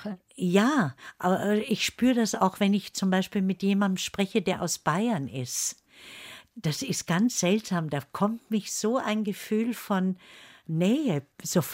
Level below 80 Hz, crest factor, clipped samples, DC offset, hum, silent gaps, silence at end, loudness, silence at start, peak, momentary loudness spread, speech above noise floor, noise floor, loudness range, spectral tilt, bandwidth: -66 dBFS; 18 dB; under 0.1%; under 0.1%; none; none; 0 s; -27 LUFS; 0 s; -10 dBFS; 9 LU; 21 dB; -47 dBFS; 3 LU; -5 dB/octave; 16 kHz